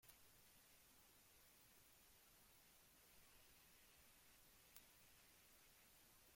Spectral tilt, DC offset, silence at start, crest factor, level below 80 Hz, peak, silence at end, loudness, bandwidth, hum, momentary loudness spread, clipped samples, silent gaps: -1.5 dB/octave; under 0.1%; 0 s; 34 dB; -84 dBFS; -38 dBFS; 0 s; -69 LUFS; 16.5 kHz; none; 3 LU; under 0.1%; none